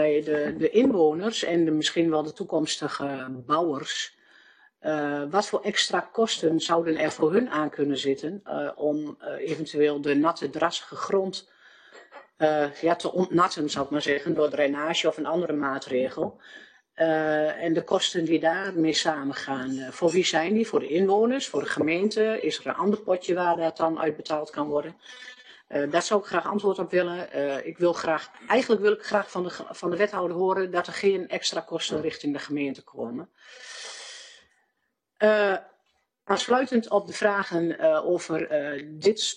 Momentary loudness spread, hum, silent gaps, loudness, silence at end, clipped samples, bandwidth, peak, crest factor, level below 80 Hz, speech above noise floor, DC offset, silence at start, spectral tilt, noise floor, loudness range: 9 LU; none; none; -26 LUFS; 0 s; under 0.1%; 10 kHz; -6 dBFS; 20 dB; -72 dBFS; 52 dB; under 0.1%; 0 s; -4 dB/octave; -77 dBFS; 4 LU